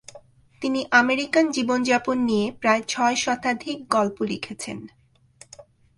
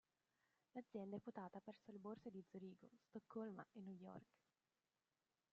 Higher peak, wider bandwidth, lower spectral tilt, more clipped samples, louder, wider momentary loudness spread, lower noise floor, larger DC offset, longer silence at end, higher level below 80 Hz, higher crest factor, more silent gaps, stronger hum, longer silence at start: first, -2 dBFS vs -40 dBFS; first, 11.5 kHz vs 7 kHz; second, -3.5 dB/octave vs -7.5 dB/octave; neither; first, -22 LUFS vs -57 LUFS; first, 12 LU vs 8 LU; second, -53 dBFS vs under -90 dBFS; neither; second, 0.35 s vs 1.3 s; first, -62 dBFS vs under -90 dBFS; about the same, 22 dB vs 18 dB; neither; neither; second, 0.15 s vs 0.75 s